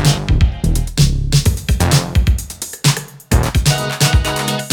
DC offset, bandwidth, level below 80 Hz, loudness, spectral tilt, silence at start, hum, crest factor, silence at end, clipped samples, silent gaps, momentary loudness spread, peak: under 0.1%; 19.5 kHz; -20 dBFS; -16 LUFS; -4.5 dB/octave; 0 s; none; 14 dB; 0 s; under 0.1%; none; 5 LU; 0 dBFS